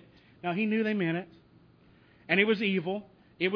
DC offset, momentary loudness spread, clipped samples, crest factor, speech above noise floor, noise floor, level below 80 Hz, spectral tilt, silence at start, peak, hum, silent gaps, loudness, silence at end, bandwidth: under 0.1%; 13 LU; under 0.1%; 20 dB; 31 dB; -60 dBFS; -72 dBFS; -8 dB/octave; 0.45 s; -10 dBFS; none; none; -29 LUFS; 0 s; 5.4 kHz